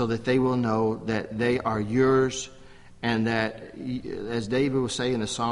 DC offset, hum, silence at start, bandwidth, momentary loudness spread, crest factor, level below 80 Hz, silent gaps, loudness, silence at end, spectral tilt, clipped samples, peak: under 0.1%; none; 0 s; 11.5 kHz; 11 LU; 16 dB; -52 dBFS; none; -26 LUFS; 0 s; -5.5 dB/octave; under 0.1%; -10 dBFS